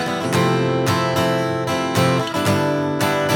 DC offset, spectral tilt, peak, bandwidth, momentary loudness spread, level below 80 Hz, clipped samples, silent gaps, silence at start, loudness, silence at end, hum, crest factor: under 0.1%; -5.5 dB/octave; -4 dBFS; 19 kHz; 3 LU; -56 dBFS; under 0.1%; none; 0 s; -19 LUFS; 0 s; none; 14 dB